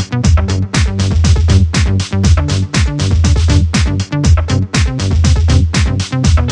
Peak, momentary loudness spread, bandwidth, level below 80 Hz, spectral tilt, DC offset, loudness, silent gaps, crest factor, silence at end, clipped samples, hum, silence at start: 0 dBFS; 4 LU; 10 kHz; -16 dBFS; -5.5 dB/octave; under 0.1%; -12 LUFS; none; 10 dB; 0 s; under 0.1%; none; 0 s